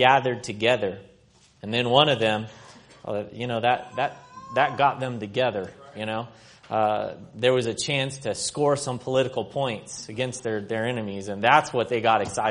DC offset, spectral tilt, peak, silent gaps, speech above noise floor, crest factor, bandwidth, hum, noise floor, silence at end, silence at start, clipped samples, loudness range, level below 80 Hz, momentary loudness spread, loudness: under 0.1%; -4 dB/octave; -2 dBFS; none; 33 dB; 24 dB; 10.5 kHz; none; -58 dBFS; 0 s; 0 s; under 0.1%; 2 LU; -62 dBFS; 14 LU; -25 LUFS